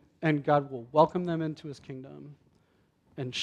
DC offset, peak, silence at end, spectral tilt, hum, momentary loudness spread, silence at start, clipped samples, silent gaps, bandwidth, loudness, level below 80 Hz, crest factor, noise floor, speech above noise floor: under 0.1%; -8 dBFS; 0 s; -6.5 dB/octave; none; 21 LU; 0.2 s; under 0.1%; none; 9.6 kHz; -28 LUFS; -68 dBFS; 22 dB; -68 dBFS; 39 dB